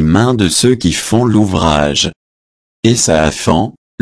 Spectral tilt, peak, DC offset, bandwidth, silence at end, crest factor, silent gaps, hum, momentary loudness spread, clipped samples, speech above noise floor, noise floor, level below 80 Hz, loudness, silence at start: -4.5 dB/octave; 0 dBFS; under 0.1%; 11 kHz; 0.3 s; 12 dB; 2.16-2.83 s; none; 5 LU; under 0.1%; over 79 dB; under -90 dBFS; -32 dBFS; -12 LUFS; 0 s